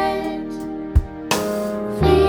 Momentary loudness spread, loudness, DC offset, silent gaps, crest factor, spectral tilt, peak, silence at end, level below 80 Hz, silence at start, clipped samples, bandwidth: 8 LU; -22 LUFS; under 0.1%; none; 16 dB; -6 dB/octave; -4 dBFS; 0 s; -26 dBFS; 0 s; under 0.1%; over 20 kHz